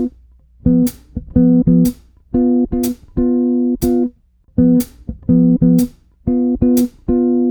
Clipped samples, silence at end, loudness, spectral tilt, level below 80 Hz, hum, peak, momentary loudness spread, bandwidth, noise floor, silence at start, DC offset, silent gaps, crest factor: under 0.1%; 0 s; -15 LUFS; -8.5 dB/octave; -32 dBFS; none; 0 dBFS; 11 LU; over 20 kHz; -46 dBFS; 0 s; under 0.1%; none; 14 dB